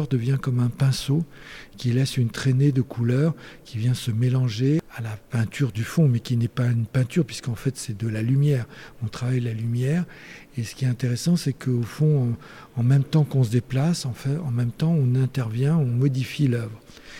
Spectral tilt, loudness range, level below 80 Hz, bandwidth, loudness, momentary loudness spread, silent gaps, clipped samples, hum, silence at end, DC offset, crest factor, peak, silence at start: -7 dB/octave; 3 LU; -52 dBFS; 15 kHz; -24 LUFS; 12 LU; none; under 0.1%; none; 0 s; under 0.1%; 14 dB; -10 dBFS; 0 s